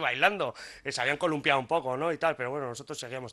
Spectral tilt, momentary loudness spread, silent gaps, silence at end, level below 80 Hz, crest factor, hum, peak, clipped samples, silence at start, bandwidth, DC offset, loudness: -4 dB/octave; 12 LU; none; 0 s; -68 dBFS; 22 dB; none; -8 dBFS; under 0.1%; 0 s; 12.5 kHz; under 0.1%; -29 LUFS